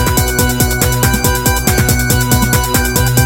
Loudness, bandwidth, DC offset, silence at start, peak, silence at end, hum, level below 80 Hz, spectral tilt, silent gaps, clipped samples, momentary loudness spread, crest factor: -12 LUFS; 18 kHz; under 0.1%; 0 s; 0 dBFS; 0 s; none; -20 dBFS; -4 dB/octave; none; under 0.1%; 1 LU; 12 dB